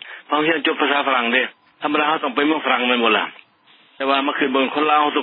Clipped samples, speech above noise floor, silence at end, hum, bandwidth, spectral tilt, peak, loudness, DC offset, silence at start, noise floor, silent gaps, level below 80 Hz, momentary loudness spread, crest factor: under 0.1%; 35 dB; 0 s; none; 4.3 kHz; -8.5 dB/octave; -2 dBFS; -18 LUFS; under 0.1%; 0.05 s; -53 dBFS; none; -84 dBFS; 6 LU; 18 dB